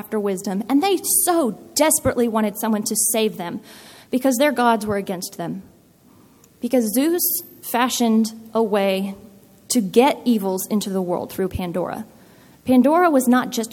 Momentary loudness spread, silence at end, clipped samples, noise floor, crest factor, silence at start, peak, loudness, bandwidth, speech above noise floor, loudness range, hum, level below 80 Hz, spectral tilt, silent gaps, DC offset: 13 LU; 0 s; under 0.1%; -52 dBFS; 18 dB; 0.05 s; -2 dBFS; -20 LUFS; 17.5 kHz; 32 dB; 4 LU; none; -52 dBFS; -4 dB/octave; none; under 0.1%